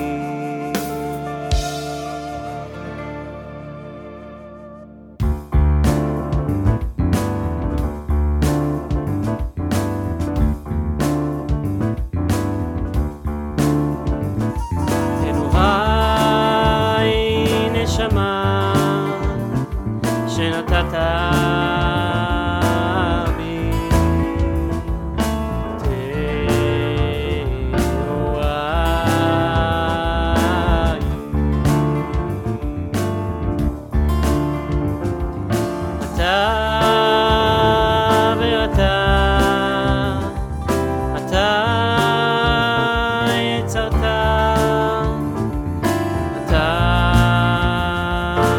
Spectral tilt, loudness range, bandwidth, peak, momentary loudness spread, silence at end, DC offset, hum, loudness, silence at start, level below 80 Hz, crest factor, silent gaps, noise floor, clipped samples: -6 dB/octave; 5 LU; 18.5 kHz; 0 dBFS; 9 LU; 0 s; under 0.1%; none; -19 LUFS; 0 s; -26 dBFS; 18 dB; none; -39 dBFS; under 0.1%